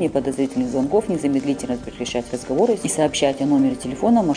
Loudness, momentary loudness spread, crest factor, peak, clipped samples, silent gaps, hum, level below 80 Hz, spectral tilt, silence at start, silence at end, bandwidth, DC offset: -21 LUFS; 8 LU; 14 dB; -6 dBFS; under 0.1%; none; none; -48 dBFS; -5 dB/octave; 0 s; 0 s; 10 kHz; under 0.1%